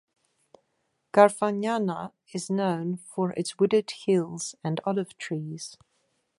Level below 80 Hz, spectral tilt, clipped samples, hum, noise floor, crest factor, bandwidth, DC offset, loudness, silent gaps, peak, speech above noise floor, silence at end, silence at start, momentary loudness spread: -76 dBFS; -5.5 dB/octave; under 0.1%; none; -76 dBFS; 24 dB; 11.5 kHz; under 0.1%; -27 LUFS; none; -2 dBFS; 49 dB; 0.65 s; 1.15 s; 16 LU